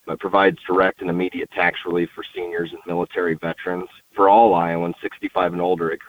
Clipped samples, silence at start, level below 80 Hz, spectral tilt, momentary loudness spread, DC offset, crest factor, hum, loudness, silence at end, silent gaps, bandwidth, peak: under 0.1%; 0.05 s; -56 dBFS; -7.5 dB/octave; 13 LU; under 0.1%; 18 dB; none; -20 LUFS; 0.05 s; none; 16.5 kHz; -2 dBFS